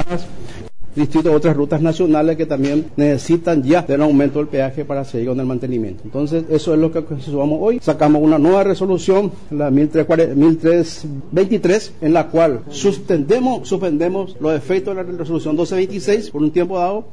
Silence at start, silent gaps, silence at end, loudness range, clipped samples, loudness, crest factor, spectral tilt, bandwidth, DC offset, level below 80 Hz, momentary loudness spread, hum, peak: 0 s; none; 0.1 s; 4 LU; under 0.1%; -17 LUFS; 12 dB; -7 dB/octave; 10.5 kHz; 3%; -46 dBFS; 10 LU; none; -4 dBFS